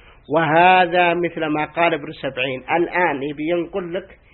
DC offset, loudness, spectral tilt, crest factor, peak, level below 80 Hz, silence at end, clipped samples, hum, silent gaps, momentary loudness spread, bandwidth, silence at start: under 0.1%; -19 LUFS; -10.5 dB/octave; 18 dB; 0 dBFS; -54 dBFS; 0.2 s; under 0.1%; none; none; 13 LU; 4.3 kHz; 0.3 s